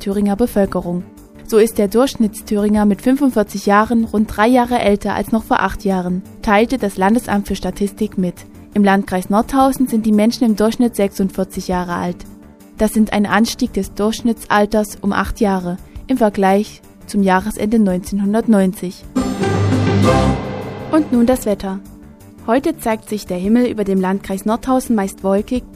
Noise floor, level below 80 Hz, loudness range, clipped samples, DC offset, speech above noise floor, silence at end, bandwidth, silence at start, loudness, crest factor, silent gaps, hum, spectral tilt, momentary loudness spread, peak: -39 dBFS; -36 dBFS; 3 LU; under 0.1%; under 0.1%; 23 dB; 0 s; 15.5 kHz; 0 s; -16 LUFS; 16 dB; none; none; -6 dB/octave; 9 LU; 0 dBFS